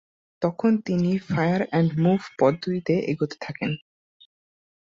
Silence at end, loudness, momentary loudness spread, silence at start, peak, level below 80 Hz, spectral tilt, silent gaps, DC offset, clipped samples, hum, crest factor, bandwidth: 1.1 s; -24 LUFS; 8 LU; 0.4 s; -6 dBFS; -60 dBFS; -8 dB/octave; none; under 0.1%; under 0.1%; none; 18 dB; 7.4 kHz